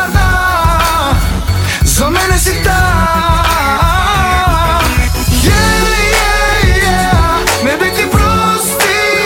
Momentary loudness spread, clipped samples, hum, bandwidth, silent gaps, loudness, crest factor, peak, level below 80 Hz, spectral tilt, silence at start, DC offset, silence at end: 2 LU; under 0.1%; none; 17.5 kHz; none; -10 LUFS; 10 dB; 0 dBFS; -16 dBFS; -4 dB/octave; 0 s; under 0.1%; 0 s